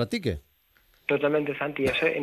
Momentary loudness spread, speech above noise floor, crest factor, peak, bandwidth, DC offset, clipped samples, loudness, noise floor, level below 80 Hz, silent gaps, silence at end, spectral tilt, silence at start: 10 LU; 38 dB; 16 dB; -10 dBFS; 14.5 kHz; under 0.1%; under 0.1%; -27 LUFS; -64 dBFS; -50 dBFS; none; 0 s; -6 dB/octave; 0 s